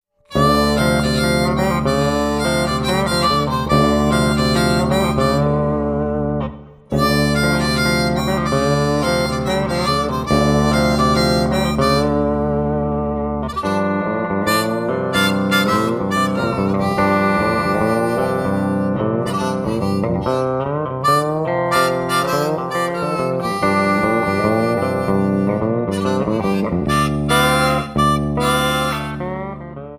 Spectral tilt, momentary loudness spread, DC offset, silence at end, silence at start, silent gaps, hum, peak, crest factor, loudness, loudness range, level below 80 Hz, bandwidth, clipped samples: -5.5 dB/octave; 5 LU; under 0.1%; 0 s; 0.3 s; none; none; 0 dBFS; 16 dB; -17 LUFS; 2 LU; -34 dBFS; 15.5 kHz; under 0.1%